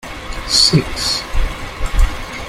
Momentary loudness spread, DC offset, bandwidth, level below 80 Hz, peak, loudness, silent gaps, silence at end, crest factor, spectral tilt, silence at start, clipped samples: 16 LU; under 0.1%; 15.5 kHz; -20 dBFS; 0 dBFS; -16 LUFS; none; 0 s; 16 dB; -3 dB/octave; 0.05 s; under 0.1%